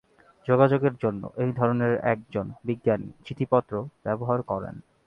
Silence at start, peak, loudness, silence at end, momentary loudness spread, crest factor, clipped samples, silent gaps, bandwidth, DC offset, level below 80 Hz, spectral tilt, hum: 0.45 s; -6 dBFS; -26 LUFS; 0.25 s; 12 LU; 20 dB; under 0.1%; none; 5.6 kHz; under 0.1%; -58 dBFS; -10 dB/octave; none